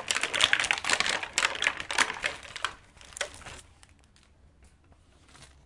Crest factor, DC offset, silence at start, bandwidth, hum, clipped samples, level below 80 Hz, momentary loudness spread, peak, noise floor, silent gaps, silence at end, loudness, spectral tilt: 30 dB; under 0.1%; 0 s; 11.5 kHz; none; under 0.1%; -58 dBFS; 18 LU; -2 dBFS; -60 dBFS; none; 0.2 s; -27 LUFS; 0.5 dB/octave